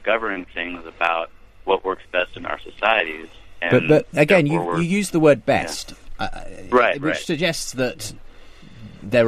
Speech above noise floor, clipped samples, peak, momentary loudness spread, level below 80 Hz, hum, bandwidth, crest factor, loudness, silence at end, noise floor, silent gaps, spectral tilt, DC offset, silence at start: 21 dB; under 0.1%; -2 dBFS; 15 LU; -44 dBFS; none; 14 kHz; 18 dB; -20 LUFS; 0 s; -41 dBFS; none; -5 dB/octave; under 0.1%; 0 s